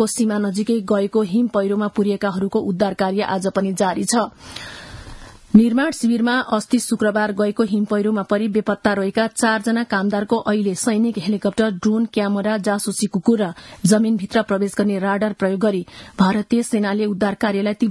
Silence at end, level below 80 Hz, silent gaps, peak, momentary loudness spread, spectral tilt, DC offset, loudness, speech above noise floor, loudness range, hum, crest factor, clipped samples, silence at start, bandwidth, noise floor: 0 s; -52 dBFS; none; 0 dBFS; 4 LU; -5.5 dB/octave; under 0.1%; -19 LUFS; 20 dB; 1 LU; none; 18 dB; under 0.1%; 0 s; 12 kHz; -38 dBFS